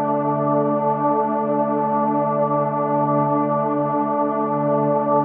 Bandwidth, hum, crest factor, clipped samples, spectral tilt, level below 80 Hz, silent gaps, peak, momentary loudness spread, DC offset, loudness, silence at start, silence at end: 3.4 kHz; none; 12 dB; under 0.1%; -13.5 dB/octave; -76 dBFS; none; -8 dBFS; 2 LU; under 0.1%; -20 LUFS; 0 s; 0 s